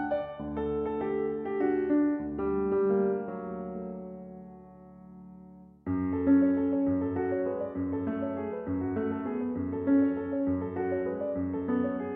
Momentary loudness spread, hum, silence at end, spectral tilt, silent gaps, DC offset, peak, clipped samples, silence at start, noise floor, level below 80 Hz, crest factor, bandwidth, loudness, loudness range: 17 LU; none; 0 s; -8.5 dB/octave; none; under 0.1%; -14 dBFS; under 0.1%; 0 s; -51 dBFS; -58 dBFS; 16 dB; 3.8 kHz; -30 LUFS; 4 LU